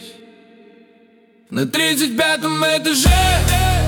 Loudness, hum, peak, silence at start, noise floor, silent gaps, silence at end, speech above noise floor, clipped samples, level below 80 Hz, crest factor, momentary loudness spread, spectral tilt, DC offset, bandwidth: -16 LUFS; none; -2 dBFS; 0 s; -52 dBFS; none; 0 s; 36 dB; under 0.1%; -26 dBFS; 14 dB; 6 LU; -3.5 dB/octave; under 0.1%; 18 kHz